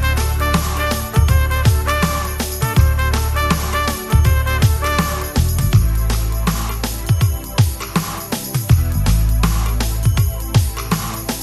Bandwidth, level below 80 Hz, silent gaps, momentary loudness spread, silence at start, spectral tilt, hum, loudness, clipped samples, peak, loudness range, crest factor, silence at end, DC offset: 15.5 kHz; -20 dBFS; none; 6 LU; 0 s; -5 dB/octave; none; -17 LUFS; under 0.1%; 0 dBFS; 2 LU; 16 dB; 0 s; under 0.1%